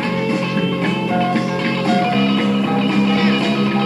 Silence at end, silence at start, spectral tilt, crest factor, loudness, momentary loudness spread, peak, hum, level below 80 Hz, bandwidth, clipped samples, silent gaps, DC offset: 0 s; 0 s; -6.5 dB/octave; 12 dB; -17 LUFS; 4 LU; -4 dBFS; none; -54 dBFS; 11.5 kHz; under 0.1%; none; under 0.1%